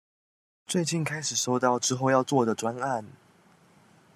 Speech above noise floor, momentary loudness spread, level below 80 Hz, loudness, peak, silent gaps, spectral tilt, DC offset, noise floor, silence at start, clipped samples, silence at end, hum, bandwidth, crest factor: 33 dB; 8 LU; -74 dBFS; -27 LUFS; -8 dBFS; none; -4 dB/octave; under 0.1%; -59 dBFS; 0.7 s; under 0.1%; 1.05 s; none; 14 kHz; 20 dB